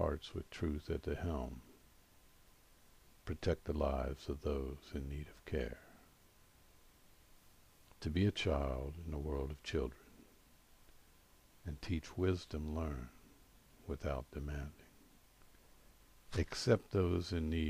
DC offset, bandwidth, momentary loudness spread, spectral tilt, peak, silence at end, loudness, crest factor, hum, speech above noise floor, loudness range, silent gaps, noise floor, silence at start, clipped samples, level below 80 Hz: under 0.1%; 15.5 kHz; 13 LU; -6.5 dB/octave; -18 dBFS; 0 s; -40 LUFS; 24 dB; none; 27 dB; 6 LU; none; -66 dBFS; 0 s; under 0.1%; -50 dBFS